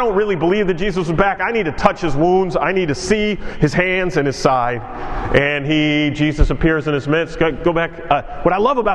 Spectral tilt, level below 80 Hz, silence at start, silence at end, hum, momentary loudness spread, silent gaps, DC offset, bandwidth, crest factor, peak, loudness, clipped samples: -6 dB/octave; -28 dBFS; 0 s; 0 s; none; 4 LU; none; under 0.1%; 11 kHz; 16 dB; 0 dBFS; -17 LUFS; under 0.1%